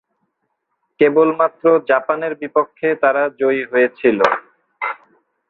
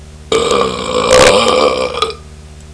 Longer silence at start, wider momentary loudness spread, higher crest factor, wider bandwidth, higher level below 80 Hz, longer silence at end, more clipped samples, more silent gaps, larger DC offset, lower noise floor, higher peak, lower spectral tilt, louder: first, 1 s vs 0 s; about the same, 11 LU vs 11 LU; about the same, 16 dB vs 12 dB; second, 6.8 kHz vs 11 kHz; second, -64 dBFS vs -34 dBFS; first, 0.55 s vs 0 s; second, under 0.1% vs 0.4%; neither; neither; first, -72 dBFS vs -33 dBFS; about the same, -2 dBFS vs 0 dBFS; first, -6.5 dB/octave vs -3 dB/octave; second, -17 LUFS vs -11 LUFS